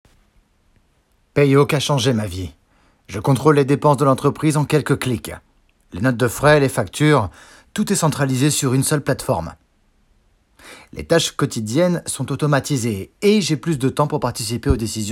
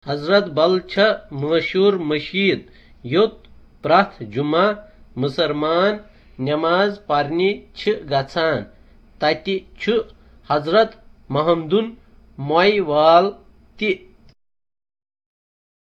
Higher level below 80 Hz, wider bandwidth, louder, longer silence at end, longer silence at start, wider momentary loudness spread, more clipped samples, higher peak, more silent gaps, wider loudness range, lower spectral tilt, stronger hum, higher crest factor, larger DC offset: first, -40 dBFS vs -50 dBFS; first, 16.5 kHz vs 7.4 kHz; about the same, -18 LUFS vs -19 LUFS; second, 0 s vs 1.9 s; first, 1.35 s vs 0.05 s; about the same, 12 LU vs 10 LU; neither; about the same, 0 dBFS vs 0 dBFS; neither; about the same, 4 LU vs 3 LU; second, -5.5 dB/octave vs -7 dB/octave; neither; about the same, 18 dB vs 20 dB; neither